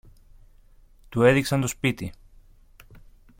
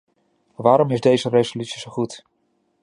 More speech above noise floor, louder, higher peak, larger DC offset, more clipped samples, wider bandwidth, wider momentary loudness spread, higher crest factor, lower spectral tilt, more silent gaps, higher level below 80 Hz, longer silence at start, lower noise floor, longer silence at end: second, 31 dB vs 49 dB; second, -23 LUFS vs -20 LUFS; second, -6 dBFS vs -2 dBFS; neither; neither; first, 16.5 kHz vs 11 kHz; about the same, 15 LU vs 13 LU; about the same, 22 dB vs 20 dB; about the same, -5.5 dB/octave vs -6 dB/octave; neither; first, -48 dBFS vs -64 dBFS; first, 1.1 s vs 0.6 s; second, -53 dBFS vs -68 dBFS; second, 0.4 s vs 0.65 s